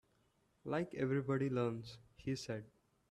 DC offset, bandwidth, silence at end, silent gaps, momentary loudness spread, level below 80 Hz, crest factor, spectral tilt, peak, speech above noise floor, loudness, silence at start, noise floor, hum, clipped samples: under 0.1%; 12.5 kHz; 0.45 s; none; 12 LU; -72 dBFS; 16 dB; -7 dB/octave; -24 dBFS; 38 dB; -40 LUFS; 0.65 s; -77 dBFS; none; under 0.1%